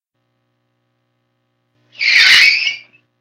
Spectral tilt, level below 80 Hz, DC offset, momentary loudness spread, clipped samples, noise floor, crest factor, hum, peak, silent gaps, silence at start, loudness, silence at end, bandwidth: 3 dB/octave; -62 dBFS; under 0.1%; 13 LU; 0.1%; -68 dBFS; 16 dB; 60 Hz at -65 dBFS; 0 dBFS; none; 2 s; -9 LUFS; 0.4 s; over 20 kHz